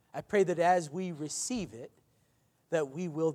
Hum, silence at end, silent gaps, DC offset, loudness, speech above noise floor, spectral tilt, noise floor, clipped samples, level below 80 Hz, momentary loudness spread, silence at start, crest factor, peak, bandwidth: none; 0 s; none; under 0.1%; -32 LUFS; 40 dB; -4.5 dB/octave; -71 dBFS; under 0.1%; -68 dBFS; 14 LU; 0.15 s; 18 dB; -14 dBFS; 15 kHz